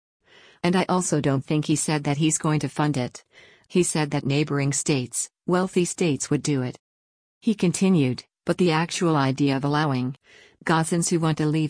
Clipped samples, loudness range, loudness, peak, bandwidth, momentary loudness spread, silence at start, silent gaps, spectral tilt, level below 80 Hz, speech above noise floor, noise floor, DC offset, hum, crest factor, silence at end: under 0.1%; 2 LU; -23 LUFS; -8 dBFS; 10.5 kHz; 6 LU; 0.65 s; 6.79-7.41 s; -5 dB/octave; -60 dBFS; over 67 dB; under -90 dBFS; under 0.1%; none; 16 dB; 0 s